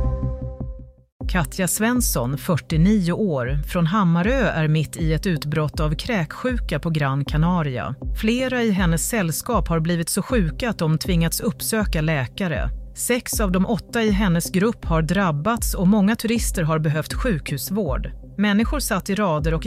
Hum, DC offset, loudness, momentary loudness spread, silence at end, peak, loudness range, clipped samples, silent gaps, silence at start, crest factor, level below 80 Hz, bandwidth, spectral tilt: none; under 0.1%; -21 LUFS; 6 LU; 0 s; -8 dBFS; 2 LU; under 0.1%; 1.12-1.20 s; 0 s; 14 dB; -30 dBFS; 16 kHz; -5.5 dB/octave